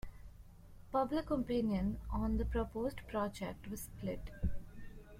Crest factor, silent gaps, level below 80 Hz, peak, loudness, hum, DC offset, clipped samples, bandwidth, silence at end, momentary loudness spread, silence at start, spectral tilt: 16 dB; none; -46 dBFS; -22 dBFS; -39 LUFS; none; under 0.1%; under 0.1%; 16.5 kHz; 0 s; 19 LU; 0.05 s; -7 dB/octave